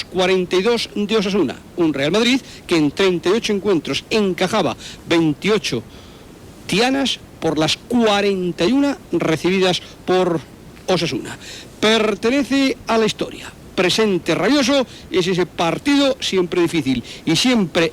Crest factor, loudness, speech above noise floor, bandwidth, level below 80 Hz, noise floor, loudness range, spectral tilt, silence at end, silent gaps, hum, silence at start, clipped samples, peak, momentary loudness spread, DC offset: 12 dB; -18 LUFS; 22 dB; 16 kHz; -48 dBFS; -40 dBFS; 2 LU; -4.5 dB/octave; 0 s; none; none; 0 s; under 0.1%; -6 dBFS; 8 LU; under 0.1%